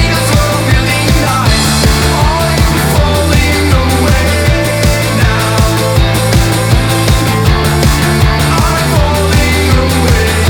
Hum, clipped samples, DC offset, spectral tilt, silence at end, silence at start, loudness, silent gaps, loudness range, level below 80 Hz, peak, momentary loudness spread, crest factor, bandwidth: none; under 0.1%; under 0.1%; -4.5 dB/octave; 0 s; 0 s; -10 LUFS; none; 0 LU; -16 dBFS; 0 dBFS; 1 LU; 8 dB; over 20 kHz